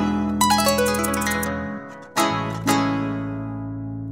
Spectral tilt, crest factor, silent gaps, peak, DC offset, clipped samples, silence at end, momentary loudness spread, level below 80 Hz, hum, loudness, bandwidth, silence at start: -4 dB/octave; 16 dB; none; -6 dBFS; 0.1%; under 0.1%; 0 s; 13 LU; -44 dBFS; none; -22 LUFS; 16.5 kHz; 0 s